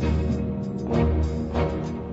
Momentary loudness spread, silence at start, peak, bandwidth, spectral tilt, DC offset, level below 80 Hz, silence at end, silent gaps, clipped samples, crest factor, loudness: 6 LU; 0 s; -10 dBFS; 8 kHz; -8.5 dB/octave; under 0.1%; -30 dBFS; 0 s; none; under 0.1%; 14 dB; -26 LUFS